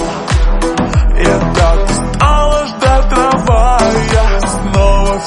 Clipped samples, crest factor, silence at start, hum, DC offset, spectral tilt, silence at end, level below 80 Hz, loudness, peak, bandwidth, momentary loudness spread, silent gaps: under 0.1%; 10 dB; 0 s; none; under 0.1%; -5.5 dB/octave; 0 s; -12 dBFS; -12 LUFS; 0 dBFS; 11.5 kHz; 4 LU; none